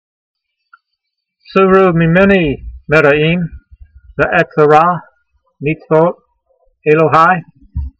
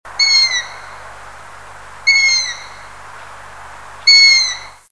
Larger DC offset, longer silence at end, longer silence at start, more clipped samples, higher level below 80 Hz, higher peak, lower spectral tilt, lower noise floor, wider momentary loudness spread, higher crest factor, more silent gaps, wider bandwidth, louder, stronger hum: second, under 0.1% vs 1%; about the same, 0.1 s vs 0.2 s; first, 1.55 s vs 0.05 s; neither; first, -34 dBFS vs -52 dBFS; about the same, 0 dBFS vs 0 dBFS; first, -8 dB/octave vs 3 dB/octave; first, -73 dBFS vs -36 dBFS; second, 14 LU vs 24 LU; about the same, 14 dB vs 16 dB; neither; second, 7.8 kHz vs 11 kHz; about the same, -11 LUFS vs -10 LUFS; second, none vs 50 Hz at -55 dBFS